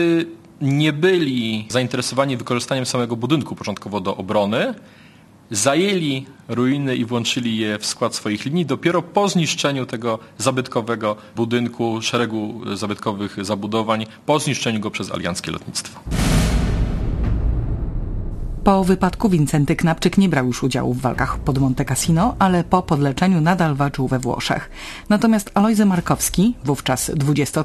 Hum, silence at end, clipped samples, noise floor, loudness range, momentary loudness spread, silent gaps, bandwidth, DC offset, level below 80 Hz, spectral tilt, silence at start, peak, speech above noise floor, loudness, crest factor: none; 0 s; under 0.1%; -47 dBFS; 4 LU; 9 LU; none; 13.5 kHz; under 0.1%; -32 dBFS; -5 dB/octave; 0 s; 0 dBFS; 28 dB; -20 LUFS; 18 dB